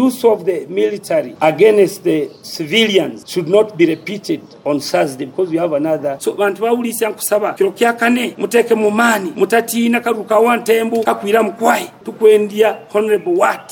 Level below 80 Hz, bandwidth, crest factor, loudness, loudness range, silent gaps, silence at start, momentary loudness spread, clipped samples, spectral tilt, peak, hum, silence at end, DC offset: -68 dBFS; over 20 kHz; 14 dB; -15 LUFS; 3 LU; none; 0 s; 8 LU; under 0.1%; -4 dB/octave; 0 dBFS; none; 0.05 s; under 0.1%